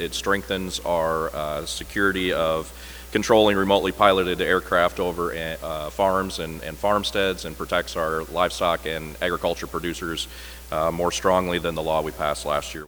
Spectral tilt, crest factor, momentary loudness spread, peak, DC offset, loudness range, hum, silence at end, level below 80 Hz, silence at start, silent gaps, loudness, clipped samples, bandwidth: -4 dB/octave; 24 dB; 11 LU; 0 dBFS; under 0.1%; 5 LU; none; 0 s; -42 dBFS; 0 s; none; -23 LUFS; under 0.1%; over 20 kHz